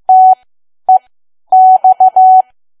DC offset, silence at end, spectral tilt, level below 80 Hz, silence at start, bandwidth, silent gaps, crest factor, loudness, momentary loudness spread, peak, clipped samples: under 0.1%; 0.4 s; -5.5 dB/octave; -68 dBFS; 0.1 s; 1.3 kHz; none; 8 dB; -8 LUFS; 9 LU; 0 dBFS; under 0.1%